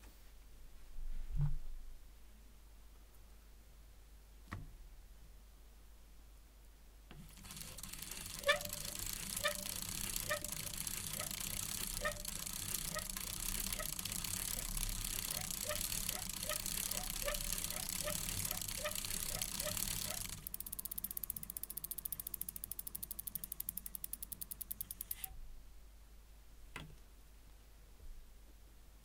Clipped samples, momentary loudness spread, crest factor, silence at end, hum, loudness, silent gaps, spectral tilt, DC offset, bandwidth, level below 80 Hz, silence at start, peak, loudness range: under 0.1%; 22 LU; 28 dB; 0 s; none; -41 LUFS; none; -1.5 dB/octave; under 0.1%; 19 kHz; -52 dBFS; 0 s; -16 dBFS; 20 LU